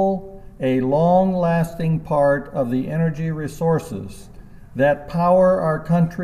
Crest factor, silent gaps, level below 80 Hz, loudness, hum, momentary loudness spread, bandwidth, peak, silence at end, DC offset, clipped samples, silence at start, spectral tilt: 14 dB; none; -44 dBFS; -19 LUFS; none; 10 LU; 13 kHz; -6 dBFS; 0 s; under 0.1%; under 0.1%; 0 s; -8.5 dB/octave